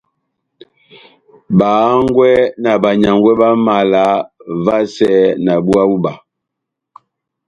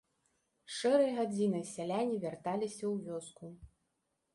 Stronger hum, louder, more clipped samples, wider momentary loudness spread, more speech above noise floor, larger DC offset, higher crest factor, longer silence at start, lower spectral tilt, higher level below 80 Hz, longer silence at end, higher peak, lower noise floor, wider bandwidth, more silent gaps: neither; first, -12 LUFS vs -35 LUFS; neither; second, 6 LU vs 15 LU; first, 67 dB vs 48 dB; neither; about the same, 14 dB vs 18 dB; first, 1.5 s vs 0.7 s; first, -7.5 dB/octave vs -5.5 dB/octave; first, -48 dBFS vs -70 dBFS; first, 1.3 s vs 0.7 s; first, 0 dBFS vs -18 dBFS; second, -78 dBFS vs -83 dBFS; about the same, 11 kHz vs 11.5 kHz; neither